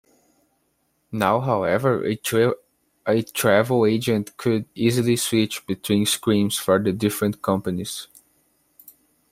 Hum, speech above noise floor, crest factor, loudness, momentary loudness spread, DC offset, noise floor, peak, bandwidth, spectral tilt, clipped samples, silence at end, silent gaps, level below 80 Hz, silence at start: none; 48 dB; 18 dB; -22 LUFS; 8 LU; under 0.1%; -69 dBFS; -4 dBFS; 16 kHz; -5 dB/octave; under 0.1%; 1.3 s; none; -60 dBFS; 1.1 s